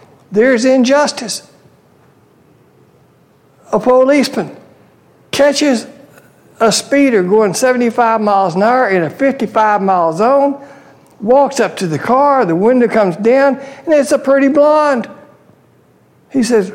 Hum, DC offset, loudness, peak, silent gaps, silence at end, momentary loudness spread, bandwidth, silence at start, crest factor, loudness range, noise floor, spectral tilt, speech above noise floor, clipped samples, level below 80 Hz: none; under 0.1%; -12 LUFS; -2 dBFS; none; 0 s; 9 LU; 16 kHz; 0.3 s; 12 dB; 5 LU; -49 dBFS; -4.5 dB/octave; 38 dB; under 0.1%; -58 dBFS